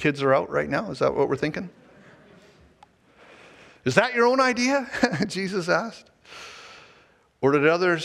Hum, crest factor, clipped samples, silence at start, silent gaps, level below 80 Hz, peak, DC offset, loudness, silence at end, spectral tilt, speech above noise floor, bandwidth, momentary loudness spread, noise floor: none; 24 dB; under 0.1%; 0 s; none; -60 dBFS; -2 dBFS; under 0.1%; -23 LUFS; 0 s; -5 dB/octave; 36 dB; 13 kHz; 21 LU; -58 dBFS